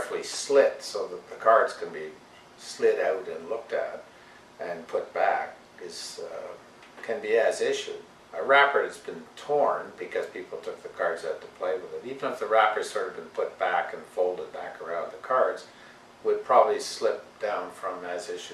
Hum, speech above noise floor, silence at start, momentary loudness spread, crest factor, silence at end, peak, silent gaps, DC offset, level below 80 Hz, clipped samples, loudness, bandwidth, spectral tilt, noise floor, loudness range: none; 23 dB; 0 s; 17 LU; 24 dB; 0 s; -4 dBFS; none; under 0.1%; -74 dBFS; under 0.1%; -28 LUFS; 13 kHz; -2.5 dB/octave; -51 dBFS; 5 LU